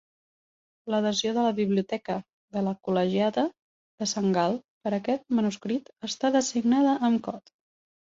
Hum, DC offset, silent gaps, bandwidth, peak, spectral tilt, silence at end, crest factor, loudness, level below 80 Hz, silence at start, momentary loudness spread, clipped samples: none; under 0.1%; 2.33-2.48 s, 3.62-3.98 s, 4.65-4.81 s; 7.8 kHz; -10 dBFS; -5 dB/octave; 0.8 s; 16 dB; -27 LUFS; -70 dBFS; 0.85 s; 10 LU; under 0.1%